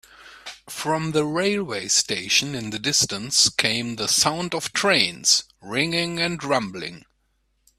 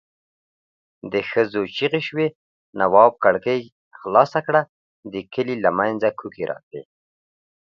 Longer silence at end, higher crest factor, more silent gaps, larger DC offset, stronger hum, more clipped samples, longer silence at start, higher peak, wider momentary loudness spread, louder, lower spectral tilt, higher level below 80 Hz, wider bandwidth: about the same, 0.8 s vs 0.85 s; about the same, 24 dB vs 22 dB; second, none vs 2.35-2.73 s, 3.72-3.91 s, 4.69-5.03 s, 6.63-6.71 s; neither; neither; neither; second, 0.2 s vs 1.05 s; about the same, 0 dBFS vs 0 dBFS; second, 13 LU vs 19 LU; about the same, -21 LUFS vs -20 LUFS; second, -2 dB/octave vs -7 dB/octave; first, -58 dBFS vs -64 dBFS; first, 15.5 kHz vs 7 kHz